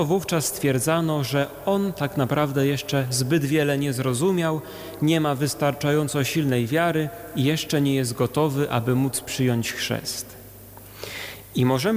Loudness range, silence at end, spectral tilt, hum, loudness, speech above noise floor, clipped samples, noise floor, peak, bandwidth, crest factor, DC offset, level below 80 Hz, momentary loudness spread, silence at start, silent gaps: 2 LU; 0 s; -5 dB/octave; none; -23 LUFS; 21 dB; under 0.1%; -43 dBFS; -10 dBFS; 19 kHz; 14 dB; under 0.1%; -54 dBFS; 10 LU; 0 s; none